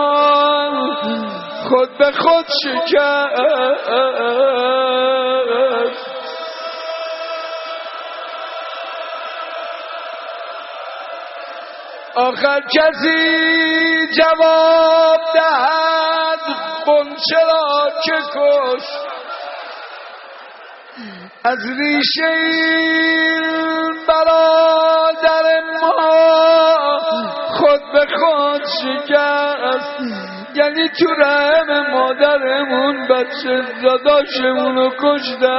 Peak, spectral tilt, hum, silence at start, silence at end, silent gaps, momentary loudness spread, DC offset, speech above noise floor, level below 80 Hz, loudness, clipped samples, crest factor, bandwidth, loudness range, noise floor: 0 dBFS; 0.5 dB/octave; none; 0 s; 0 s; none; 16 LU; under 0.1%; 23 dB; -60 dBFS; -14 LUFS; under 0.1%; 16 dB; 6 kHz; 13 LU; -37 dBFS